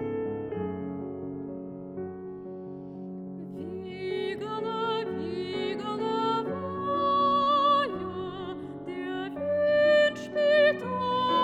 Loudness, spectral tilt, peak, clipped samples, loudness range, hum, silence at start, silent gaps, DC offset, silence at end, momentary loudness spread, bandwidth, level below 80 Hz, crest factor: -28 LUFS; -6 dB/octave; -12 dBFS; under 0.1%; 11 LU; none; 0 s; none; under 0.1%; 0 s; 17 LU; 8.6 kHz; -66 dBFS; 16 dB